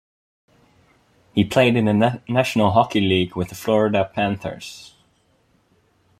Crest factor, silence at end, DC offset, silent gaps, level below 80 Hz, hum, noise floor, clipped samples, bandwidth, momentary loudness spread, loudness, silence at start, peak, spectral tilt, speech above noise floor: 20 dB; 1.35 s; under 0.1%; none; -54 dBFS; none; -62 dBFS; under 0.1%; 15.5 kHz; 13 LU; -19 LUFS; 1.35 s; -2 dBFS; -6 dB/octave; 43 dB